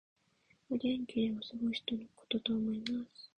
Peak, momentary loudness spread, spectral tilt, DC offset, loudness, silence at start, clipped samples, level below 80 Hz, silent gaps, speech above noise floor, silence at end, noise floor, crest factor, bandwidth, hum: -20 dBFS; 6 LU; -6 dB/octave; under 0.1%; -37 LUFS; 0.7 s; under 0.1%; -70 dBFS; none; 36 dB; 0.1 s; -72 dBFS; 18 dB; 9 kHz; none